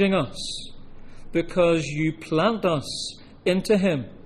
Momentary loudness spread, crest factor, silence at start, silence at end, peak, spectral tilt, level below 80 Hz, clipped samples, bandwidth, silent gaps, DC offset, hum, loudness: 11 LU; 16 dB; 0 s; 0.05 s; -8 dBFS; -5.5 dB/octave; -44 dBFS; under 0.1%; 14.5 kHz; none; under 0.1%; none; -24 LUFS